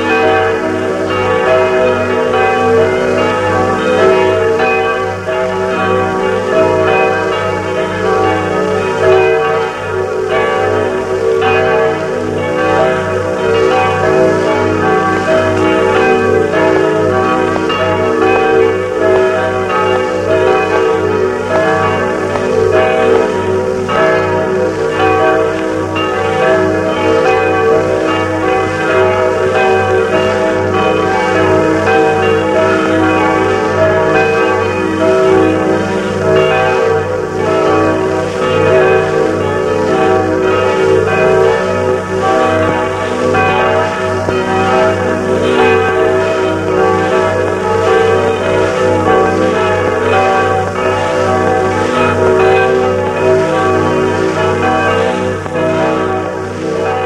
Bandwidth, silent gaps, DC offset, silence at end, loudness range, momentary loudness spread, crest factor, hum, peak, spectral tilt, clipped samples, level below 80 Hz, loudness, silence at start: 12 kHz; none; under 0.1%; 0 s; 2 LU; 4 LU; 12 dB; none; 0 dBFS; -6 dB/octave; under 0.1%; -42 dBFS; -12 LUFS; 0 s